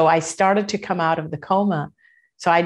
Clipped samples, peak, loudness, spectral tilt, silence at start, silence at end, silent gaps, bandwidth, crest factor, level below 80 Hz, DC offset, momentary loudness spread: under 0.1%; -4 dBFS; -21 LUFS; -5 dB/octave; 0 s; 0 s; none; 11.5 kHz; 16 dB; -64 dBFS; under 0.1%; 7 LU